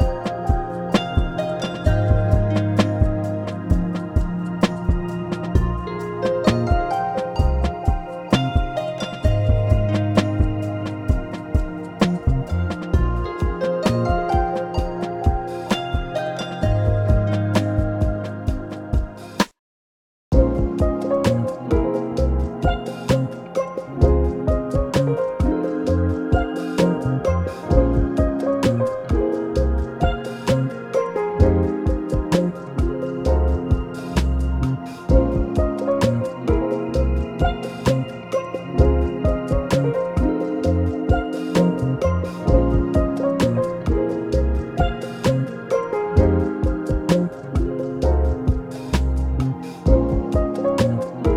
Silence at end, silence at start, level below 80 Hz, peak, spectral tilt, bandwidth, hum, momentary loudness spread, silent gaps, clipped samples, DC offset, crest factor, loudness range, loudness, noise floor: 0 s; 0 s; -26 dBFS; -2 dBFS; -7.5 dB/octave; 13.5 kHz; none; 6 LU; 19.59-20.31 s; under 0.1%; under 0.1%; 18 dB; 2 LU; -21 LUFS; under -90 dBFS